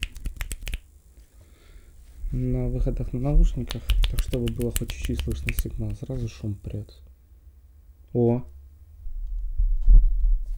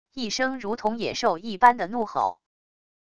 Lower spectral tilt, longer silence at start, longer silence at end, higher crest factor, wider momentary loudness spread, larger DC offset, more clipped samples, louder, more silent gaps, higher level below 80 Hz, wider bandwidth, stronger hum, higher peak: first, -6 dB/octave vs -3.5 dB/octave; about the same, 0 s vs 0.05 s; second, 0 s vs 0.65 s; about the same, 18 dB vs 22 dB; first, 14 LU vs 9 LU; second, under 0.1% vs 0.5%; neither; second, -28 LUFS vs -24 LUFS; neither; first, -26 dBFS vs -60 dBFS; first, over 20 kHz vs 11 kHz; neither; about the same, -6 dBFS vs -4 dBFS